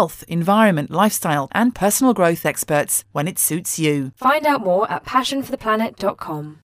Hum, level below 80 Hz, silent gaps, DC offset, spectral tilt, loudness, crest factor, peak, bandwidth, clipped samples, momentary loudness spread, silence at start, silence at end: none; -54 dBFS; none; under 0.1%; -4 dB/octave; -18 LUFS; 16 dB; -2 dBFS; 16 kHz; under 0.1%; 8 LU; 0 s; 0.1 s